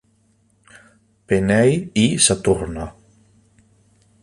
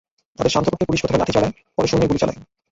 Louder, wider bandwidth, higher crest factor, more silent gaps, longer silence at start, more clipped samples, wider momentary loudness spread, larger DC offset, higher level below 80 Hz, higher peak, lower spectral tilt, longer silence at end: first, -17 LUFS vs -20 LUFS; first, 11.5 kHz vs 8 kHz; about the same, 22 dB vs 18 dB; neither; first, 1.3 s vs 0.4 s; neither; first, 15 LU vs 5 LU; neither; about the same, -44 dBFS vs -42 dBFS; about the same, 0 dBFS vs -2 dBFS; second, -4 dB/octave vs -5.5 dB/octave; first, 1.3 s vs 0.3 s